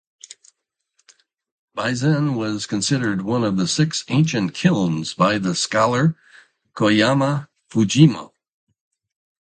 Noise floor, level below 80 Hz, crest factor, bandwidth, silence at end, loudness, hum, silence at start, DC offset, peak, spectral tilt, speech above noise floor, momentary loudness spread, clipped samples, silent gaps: -72 dBFS; -58 dBFS; 20 dB; 9.4 kHz; 1.15 s; -19 LUFS; none; 1.75 s; under 0.1%; 0 dBFS; -5.5 dB/octave; 53 dB; 8 LU; under 0.1%; none